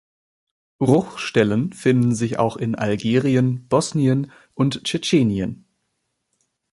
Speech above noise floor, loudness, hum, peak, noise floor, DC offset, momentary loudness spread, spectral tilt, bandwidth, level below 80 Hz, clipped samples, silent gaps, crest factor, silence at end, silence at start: 55 dB; -20 LUFS; none; -2 dBFS; -74 dBFS; under 0.1%; 5 LU; -6 dB/octave; 11.5 kHz; -54 dBFS; under 0.1%; none; 18 dB; 1.15 s; 0.8 s